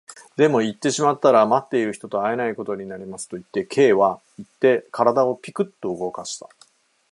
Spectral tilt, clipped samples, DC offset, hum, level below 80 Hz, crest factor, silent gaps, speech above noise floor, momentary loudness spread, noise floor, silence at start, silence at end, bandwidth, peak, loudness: -5 dB/octave; under 0.1%; under 0.1%; none; -68 dBFS; 20 dB; none; 36 dB; 16 LU; -57 dBFS; 0.1 s; 0.75 s; 11.5 kHz; -2 dBFS; -21 LUFS